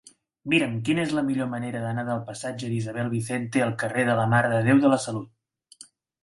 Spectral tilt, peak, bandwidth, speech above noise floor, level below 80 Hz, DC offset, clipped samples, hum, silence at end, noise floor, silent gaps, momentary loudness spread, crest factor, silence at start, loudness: -6 dB/octave; -6 dBFS; 11.5 kHz; 28 dB; -62 dBFS; under 0.1%; under 0.1%; none; 0.4 s; -52 dBFS; none; 10 LU; 18 dB; 0.45 s; -25 LUFS